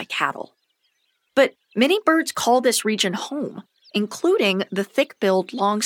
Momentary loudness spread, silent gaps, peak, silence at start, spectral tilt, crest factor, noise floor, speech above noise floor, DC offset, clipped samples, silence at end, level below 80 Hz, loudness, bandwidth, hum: 11 LU; none; -4 dBFS; 0 s; -3.5 dB/octave; 18 dB; -70 dBFS; 49 dB; under 0.1%; under 0.1%; 0 s; -72 dBFS; -21 LUFS; 18 kHz; none